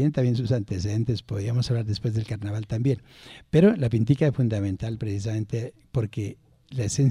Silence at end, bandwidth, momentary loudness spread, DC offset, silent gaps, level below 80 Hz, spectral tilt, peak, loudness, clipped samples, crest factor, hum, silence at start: 0 s; 11 kHz; 11 LU; under 0.1%; none; -50 dBFS; -7 dB/octave; -8 dBFS; -26 LUFS; under 0.1%; 16 dB; none; 0 s